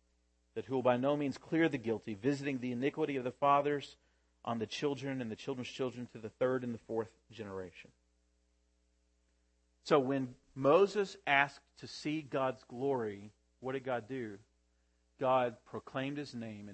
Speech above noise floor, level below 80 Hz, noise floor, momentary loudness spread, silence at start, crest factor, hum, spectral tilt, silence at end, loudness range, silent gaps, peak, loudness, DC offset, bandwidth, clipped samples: 40 dB; -74 dBFS; -75 dBFS; 16 LU; 0.55 s; 24 dB; none; -6 dB/octave; 0 s; 8 LU; none; -12 dBFS; -35 LUFS; under 0.1%; 8.4 kHz; under 0.1%